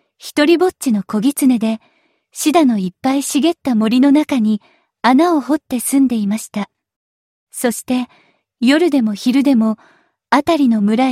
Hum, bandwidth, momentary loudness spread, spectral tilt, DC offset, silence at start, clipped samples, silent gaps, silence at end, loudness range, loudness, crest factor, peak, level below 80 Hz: none; 16 kHz; 10 LU; -4.5 dB/octave; under 0.1%; 0.25 s; under 0.1%; 6.96-7.47 s; 0 s; 4 LU; -15 LUFS; 16 dB; 0 dBFS; -60 dBFS